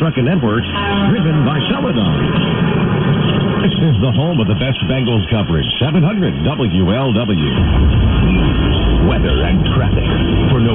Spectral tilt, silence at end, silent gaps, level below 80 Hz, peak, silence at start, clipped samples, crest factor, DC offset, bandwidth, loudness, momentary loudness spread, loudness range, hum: -11.5 dB/octave; 0 s; none; -22 dBFS; -2 dBFS; 0 s; under 0.1%; 12 dB; under 0.1%; 3.9 kHz; -14 LUFS; 3 LU; 1 LU; none